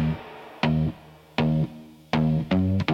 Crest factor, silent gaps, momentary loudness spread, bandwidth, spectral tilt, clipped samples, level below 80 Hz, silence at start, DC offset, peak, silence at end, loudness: 18 dB; none; 15 LU; 6.8 kHz; -8 dB/octave; under 0.1%; -46 dBFS; 0 s; under 0.1%; -6 dBFS; 0 s; -26 LUFS